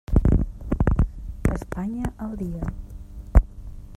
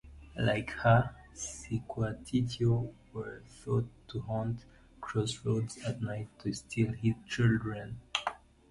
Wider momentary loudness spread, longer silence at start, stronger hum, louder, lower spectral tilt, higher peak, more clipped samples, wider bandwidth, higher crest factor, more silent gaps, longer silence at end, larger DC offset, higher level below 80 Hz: first, 18 LU vs 13 LU; about the same, 0.1 s vs 0.05 s; neither; first, -26 LUFS vs -34 LUFS; first, -9 dB/octave vs -6 dB/octave; first, -2 dBFS vs -12 dBFS; neither; about the same, 12 kHz vs 11.5 kHz; about the same, 20 dB vs 22 dB; neither; second, 0 s vs 0.35 s; neither; first, -26 dBFS vs -54 dBFS